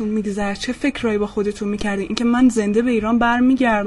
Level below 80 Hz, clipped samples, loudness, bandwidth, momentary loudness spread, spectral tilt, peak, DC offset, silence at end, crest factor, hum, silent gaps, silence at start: -40 dBFS; under 0.1%; -19 LUFS; 11.5 kHz; 7 LU; -5.5 dB/octave; 0 dBFS; under 0.1%; 0 s; 18 dB; none; none; 0 s